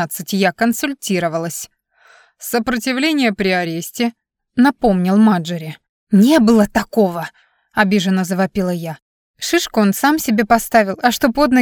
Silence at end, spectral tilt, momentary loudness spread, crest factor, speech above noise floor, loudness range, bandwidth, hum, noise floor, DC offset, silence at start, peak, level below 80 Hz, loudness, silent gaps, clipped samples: 0 s; -5 dB/octave; 13 LU; 14 dB; 35 dB; 5 LU; over 20 kHz; none; -51 dBFS; under 0.1%; 0 s; -2 dBFS; -46 dBFS; -16 LUFS; 5.89-6.07 s, 9.02-9.34 s; under 0.1%